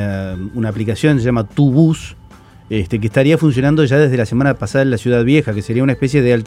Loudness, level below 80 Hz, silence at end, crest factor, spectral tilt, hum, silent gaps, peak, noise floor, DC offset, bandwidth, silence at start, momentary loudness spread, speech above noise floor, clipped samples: -15 LUFS; -40 dBFS; 0 s; 14 dB; -7.5 dB/octave; none; none; 0 dBFS; -39 dBFS; under 0.1%; 12.5 kHz; 0 s; 9 LU; 25 dB; under 0.1%